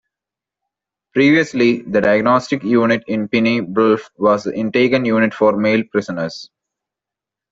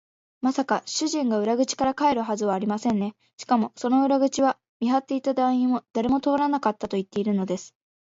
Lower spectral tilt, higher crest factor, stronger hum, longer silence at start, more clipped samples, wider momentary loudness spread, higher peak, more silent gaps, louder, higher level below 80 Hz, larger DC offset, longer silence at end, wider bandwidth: first, -6.5 dB/octave vs -5 dB/octave; about the same, 14 dB vs 16 dB; neither; first, 1.15 s vs 0.45 s; neither; about the same, 8 LU vs 6 LU; first, -2 dBFS vs -8 dBFS; second, none vs 4.69-4.80 s; first, -16 LUFS vs -24 LUFS; first, -56 dBFS vs -62 dBFS; neither; first, 1.1 s vs 0.35 s; about the same, 7.8 kHz vs 7.8 kHz